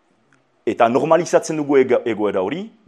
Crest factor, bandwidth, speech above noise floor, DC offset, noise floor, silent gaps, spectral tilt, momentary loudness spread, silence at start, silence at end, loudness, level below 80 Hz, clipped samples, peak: 18 dB; 12 kHz; 42 dB; under 0.1%; -60 dBFS; none; -5.5 dB/octave; 9 LU; 0.65 s; 0.2 s; -18 LUFS; -70 dBFS; under 0.1%; 0 dBFS